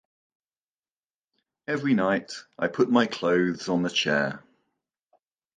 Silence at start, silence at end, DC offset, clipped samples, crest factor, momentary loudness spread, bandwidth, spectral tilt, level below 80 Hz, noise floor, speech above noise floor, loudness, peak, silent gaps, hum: 1.7 s; 1.2 s; under 0.1%; under 0.1%; 20 dB; 9 LU; 9.4 kHz; -5 dB/octave; -68 dBFS; under -90 dBFS; over 65 dB; -25 LUFS; -8 dBFS; none; none